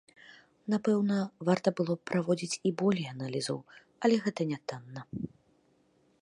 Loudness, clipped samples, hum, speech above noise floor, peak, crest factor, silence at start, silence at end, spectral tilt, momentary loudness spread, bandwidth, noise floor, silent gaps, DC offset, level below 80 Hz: -31 LUFS; under 0.1%; none; 38 dB; -12 dBFS; 20 dB; 0.3 s; 0.95 s; -6 dB/octave; 13 LU; 11.5 kHz; -68 dBFS; none; under 0.1%; -72 dBFS